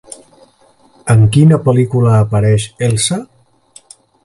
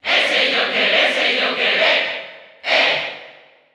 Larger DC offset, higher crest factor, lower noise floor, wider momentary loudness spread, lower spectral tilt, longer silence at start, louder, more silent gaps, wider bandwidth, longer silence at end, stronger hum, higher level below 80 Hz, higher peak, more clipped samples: neither; about the same, 14 dB vs 16 dB; first, -50 dBFS vs -45 dBFS; second, 8 LU vs 14 LU; first, -6 dB/octave vs -1.5 dB/octave; first, 1.05 s vs 0.05 s; first, -12 LUFS vs -15 LUFS; neither; second, 11.5 kHz vs 15 kHz; first, 1 s vs 0.45 s; neither; first, -42 dBFS vs -66 dBFS; about the same, 0 dBFS vs -2 dBFS; neither